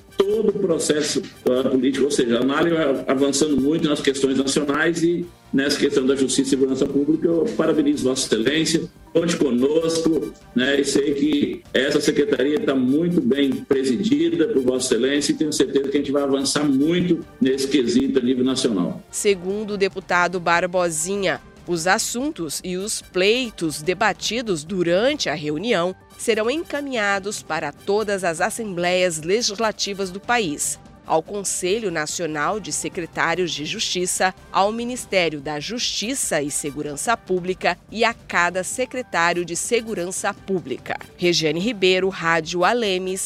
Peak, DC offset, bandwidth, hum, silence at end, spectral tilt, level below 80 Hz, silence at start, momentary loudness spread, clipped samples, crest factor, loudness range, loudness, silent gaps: -2 dBFS; under 0.1%; 15.5 kHz; none; 0 s; -3.5 dB/octave; -52 dBFS; 0.1 s; 6 LU; under 0.1%; 18 dB; 3 LU; -21 LUFS; none